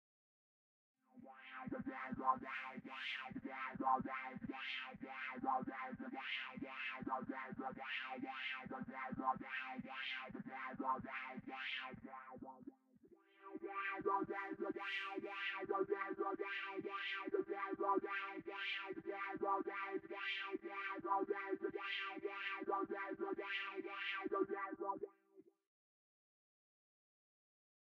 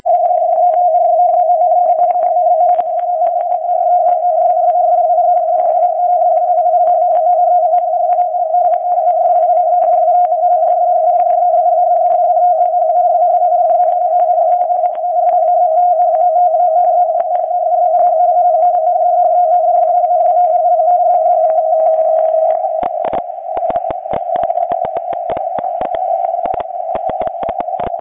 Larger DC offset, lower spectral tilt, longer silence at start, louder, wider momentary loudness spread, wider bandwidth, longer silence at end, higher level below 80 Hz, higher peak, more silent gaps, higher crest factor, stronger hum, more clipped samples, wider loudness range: neither; second, -6 dB/octave vs -8.5 dB/octave; first, 1.15 s vs 0.05 s; second, -44 LUFS vs -12 LUFS; about the same, 9 LU vs 7 LU; first, 7.4 kHz vs 3.5 kHz; first, 2.4 s vs 0 s; second, -82 dBFS vs -54 dBFS; second, -24 dBFS vs -2 dBFS; neither; first, 22 dB vs 10 dB; neither; neither; about the same, 4 LU vs 6 LU